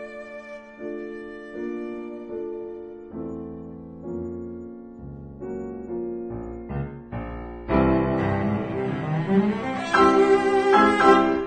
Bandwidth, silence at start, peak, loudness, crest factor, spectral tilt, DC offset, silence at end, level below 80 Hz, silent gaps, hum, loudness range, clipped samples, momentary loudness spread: 9.2 kHz; 0 s; -4 dBFS; -23 LUFS; 20 dB; -7 dB/octave; under 0.1%; 0 s; -44 dBFS; none; none; 15 LU; under 0.1%; 21 LU